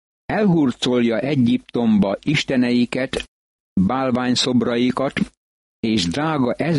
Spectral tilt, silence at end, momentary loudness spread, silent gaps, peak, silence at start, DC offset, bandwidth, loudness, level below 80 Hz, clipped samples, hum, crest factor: -5.5 dB/octave; 0 s; 8 LU; 3.28-3.76 s, 5.37-5.83 s; -6 dBFS; 0.3 s; under 0.1%; 11.5 kHz; -19 LUFS; -50 dBFS; under 0.1%; none; 14 dB